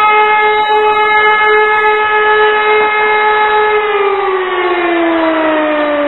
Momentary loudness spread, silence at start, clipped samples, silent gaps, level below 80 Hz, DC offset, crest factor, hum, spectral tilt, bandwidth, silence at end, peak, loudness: 4 LU; 0 s; under 0.1%; none; -50 dBFS; 0.7%; 10 dB; none; -5 dB/octave; 4.2 kHz; 0 s; 0 dBFS; -10 LUFS